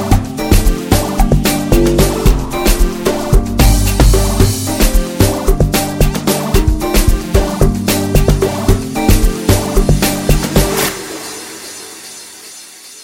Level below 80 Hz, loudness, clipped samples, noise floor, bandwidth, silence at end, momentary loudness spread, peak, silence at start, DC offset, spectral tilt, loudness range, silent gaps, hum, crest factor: -16 dBFS; -13 LUFS; under 0.1%; -34 dBFS; 17 kHz; 0 s; 14 LU; 0 dBFS; 0 s; under 0.1%; -5 dB/octave; 2 LU; none; none; 12 dB